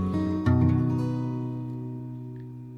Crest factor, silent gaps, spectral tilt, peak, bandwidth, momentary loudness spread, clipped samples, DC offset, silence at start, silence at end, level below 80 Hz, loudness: 16 dB; none; -10 dB/octave; -10 dBFS; 6.8 kHz; 16 LU; under 0.1%; under 0.1%; 0 s; 0 s; -50 dBFS; -27 LUFS